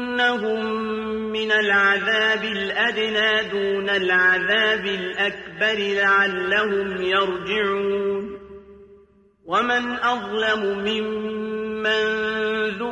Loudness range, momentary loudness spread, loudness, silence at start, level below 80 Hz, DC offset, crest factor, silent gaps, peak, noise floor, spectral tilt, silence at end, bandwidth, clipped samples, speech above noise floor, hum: 5 LU; 9 LU; -21 LUFS; 0 s; -58 dBFS; under 0.1%; 14 dB; none; -8 dBFS; -54 dBFS; -4 dB/octave; 0 s; 9 kHz; under 0.1%; 33 dB; none